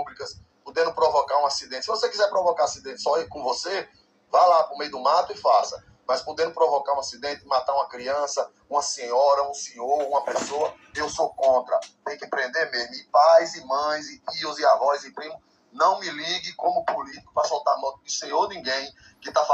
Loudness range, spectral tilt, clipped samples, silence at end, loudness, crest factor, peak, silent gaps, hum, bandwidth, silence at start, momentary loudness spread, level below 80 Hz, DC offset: 3 LU; -1.5 dB/octave; under 0.1%; 0 s; -24 LUFS; 18 dB; -6 dBFS; none; none; 8.8 kHz; 0 s; 11 LU; -66 dBFS; under 0.1%